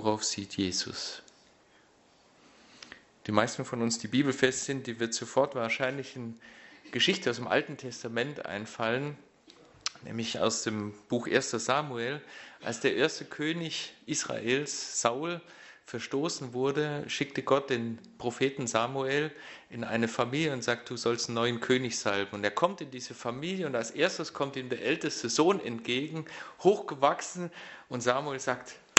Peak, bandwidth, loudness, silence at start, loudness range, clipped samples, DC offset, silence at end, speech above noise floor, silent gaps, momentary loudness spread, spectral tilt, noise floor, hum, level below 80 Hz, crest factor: 0 dBFS; 8.2 kHz; -31 LUFS; 0 s; 4 LU; under 0.1%; under 0.1%; 0.2 s; 31 dB; none; 12 LU; -3.5 dB/octave; -63 dBFS; none; -70 dBFS; 32 dB